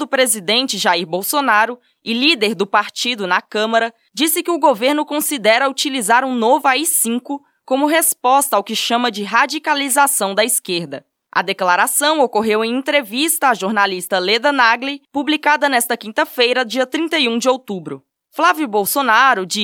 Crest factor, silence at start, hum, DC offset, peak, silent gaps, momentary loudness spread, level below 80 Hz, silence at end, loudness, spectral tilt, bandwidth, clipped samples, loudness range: 16 dB; 0 s; none; under 0.1%; 0 dBFS; none; 8 LU; -74 dBFS; 0 s; -16 LUFS; -1.5 dB/octave; 18.5 kHz; under 0.1%; 2 LU